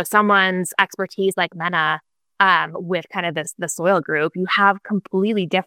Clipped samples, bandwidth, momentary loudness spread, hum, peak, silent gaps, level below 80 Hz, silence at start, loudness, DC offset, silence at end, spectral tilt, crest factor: under 0.1%; 17 kHz; 9 LU; none; 0 dBFS; none; -72 dBFS; 0 s; -19 LUFS; under 0.1%; 0.05 s; -4 dB/octave; 20 dB